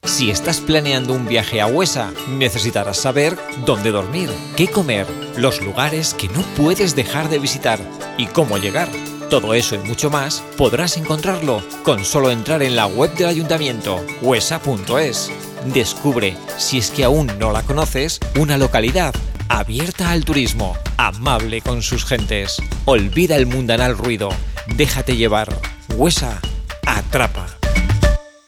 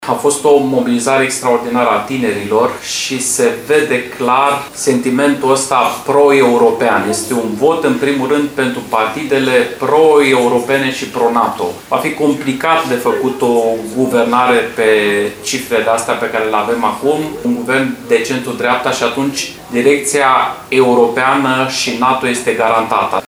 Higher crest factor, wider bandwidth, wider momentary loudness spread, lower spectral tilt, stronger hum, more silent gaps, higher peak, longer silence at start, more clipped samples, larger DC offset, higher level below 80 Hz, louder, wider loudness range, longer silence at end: first, 18 dB vs 12 dB; second, 18 kHz vs over 20 kHz; about the same, 7 LU vs 6 LU; about the same, -4 dB/octave vs -3.5 dB/octave; neither; neither; about the same, 0 dBFS vs 0 dBFS; about the same, 0.05 s vs 0 s; neither; neither; first, -28 dBFS vs -52 dBFS; second, -18 LUFS vs -13 LUFS; about the same, 1 LU vs 3 LU; first, 0.2 s vs 0.05 s